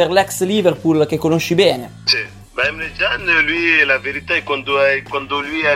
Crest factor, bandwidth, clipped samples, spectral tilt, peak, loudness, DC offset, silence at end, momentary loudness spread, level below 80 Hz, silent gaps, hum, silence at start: 14 dB; 16 kHz; under 0.1%; -4 dB/octave; -2 dBFS; -16 LUFS; under 0.1%; 0 s; 7 LU; -46 dBFS; none; none; 0 s